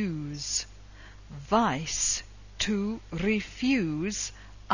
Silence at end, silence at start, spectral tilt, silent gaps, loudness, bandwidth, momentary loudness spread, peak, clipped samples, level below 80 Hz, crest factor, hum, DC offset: 0 s; 0 s; -3.5 dB/octave; none; -29 LUFS; 7.4 kHz; 11 LU; -10 dBFS; under 0.1%; -48 dBFS; 20 dB; 50 Hz at -50 dBFS; under 0.1%